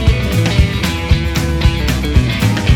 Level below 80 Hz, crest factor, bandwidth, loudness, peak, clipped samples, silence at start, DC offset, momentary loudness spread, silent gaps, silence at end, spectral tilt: -16 dBFS; 12 dB; 17 kHz; -15 LUFS; 0 dBFS; under 0.1%; 0 s; under 0.1%; 3 LU; none; 0 s; -5.5 dB/octave